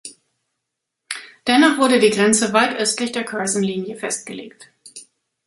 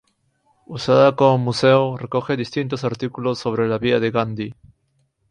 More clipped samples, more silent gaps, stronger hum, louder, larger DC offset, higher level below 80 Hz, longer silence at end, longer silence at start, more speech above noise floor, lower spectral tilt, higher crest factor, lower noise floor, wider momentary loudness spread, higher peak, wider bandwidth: neither; neither; neither; about the same, -17 LUFS vs -19 LUFS; neither; second, -64 dBFS vs -56 dBFS; second, 0.45 s vs 0.8 s; second, 0.05 s vs 0.7 s; first, 62 dB vs 48 dB; second, -3 dB/octave vs -6.5 dB/octave; about the same, 18 dB vs 18 dB; first, -80 dBFS vs -66 dBFS; first, 20 LU vs 11 LU; about the same, -2 dBFS vs -2 dBFS; first, 11.5 kHz vs 10 kHz